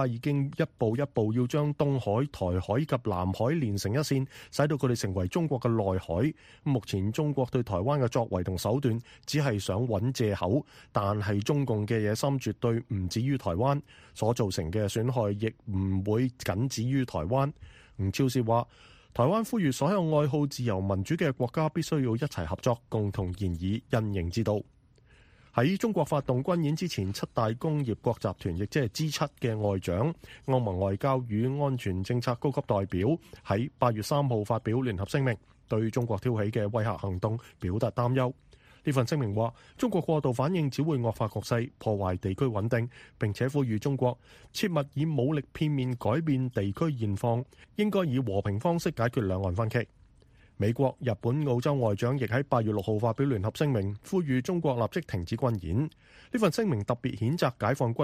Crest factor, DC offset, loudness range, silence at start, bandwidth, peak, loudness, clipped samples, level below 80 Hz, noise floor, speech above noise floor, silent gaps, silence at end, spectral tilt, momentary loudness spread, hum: 20 dB; under 0.1%; 2 LU; 0 s; 15.5 kHz; -8 dBFS; -29 LUFS; under 0.1%; -54 dBFS; -59 dBFS; 31 dB; none; 0 s; -7 dB/octave; 5 LU; none